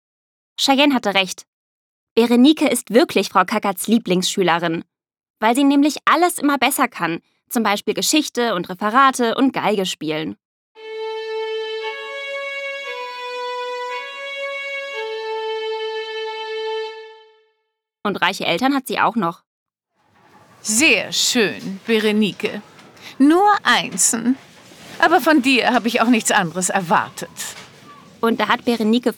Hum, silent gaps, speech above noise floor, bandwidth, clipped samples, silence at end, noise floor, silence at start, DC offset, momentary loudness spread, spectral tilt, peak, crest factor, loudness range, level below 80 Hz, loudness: none; 1.48-2.16 s, 5.30-5.34 s, 10.45-10.75 s, 19.47-19.66 s; 57 dB; 19 kHz; under 0.1%; 0 s; -74 dBFS; 0.6 s; under 0.1%; 14 LU; -3 dB/octave; 0 dBFS; 18 dB; 10 LU; -68 dBFS; -18 LUFS